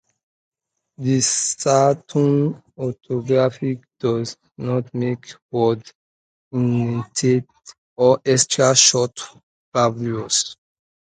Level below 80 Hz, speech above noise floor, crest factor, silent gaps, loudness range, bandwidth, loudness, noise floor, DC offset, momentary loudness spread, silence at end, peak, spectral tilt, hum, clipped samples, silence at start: -60 dBFS; over 71 dB; 20 dB; 5.42-5.49 s, 5.95-6.51 s, 7.78-7.96 s, 9.43-9.72 s; 6 LU; 9.6 kHz; -19 LUFS; under -90 dBFS; under 0.1%; 13 LU; 0.6 s; -2 dBFS; -4 dB/octave; none; under 0.1%; 1 s